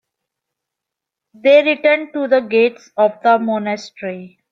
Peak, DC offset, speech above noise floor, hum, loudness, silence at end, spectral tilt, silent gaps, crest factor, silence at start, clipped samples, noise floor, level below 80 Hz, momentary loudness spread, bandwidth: -2 dBFS; under 0.1%; 67 dB; none; -15 LUFS; 0.25 s; -5.5 dB/octave; none; 16 dB; 1.45 s; under 0.1%; -83 dBFS; -70 dBFS; 16 LU; 7.4 kHz